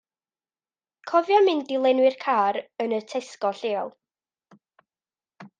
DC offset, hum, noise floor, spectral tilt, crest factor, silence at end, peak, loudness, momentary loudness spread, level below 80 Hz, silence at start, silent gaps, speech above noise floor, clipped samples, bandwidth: under 0.1%; none; under -90 dBFS; -4.5 dB/octave; 18 dB; 0.15 s; -8 dBFS; -23 LUFS; 11 LU; -86 dBFS; 1.05 s; none; over 67 dB; under 0.1%; 9.2 kHz